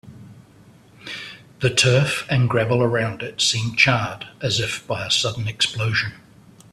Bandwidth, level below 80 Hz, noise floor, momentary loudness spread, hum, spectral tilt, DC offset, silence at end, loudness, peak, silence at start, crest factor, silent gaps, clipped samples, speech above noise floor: 13.5 kHz; -54 dBFS; -49 dBFS; 15 LU; none; -3.5 dB/octave; under 0.1%; 0.55 s; -20 LUFS; 0 dBFS; 0.05 s; 22 dB; none; under 0.1%; 29 dB